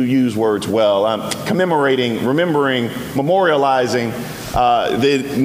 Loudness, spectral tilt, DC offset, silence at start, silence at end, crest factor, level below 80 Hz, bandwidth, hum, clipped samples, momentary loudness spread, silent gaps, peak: -16 LUFS; -5.5 dB/octave; under 0.1%; 0 s; 0 s; 14 dB; -42 dBFS; 16 kHz; none; under 0.1%; 6 LU; none; -2 dBFS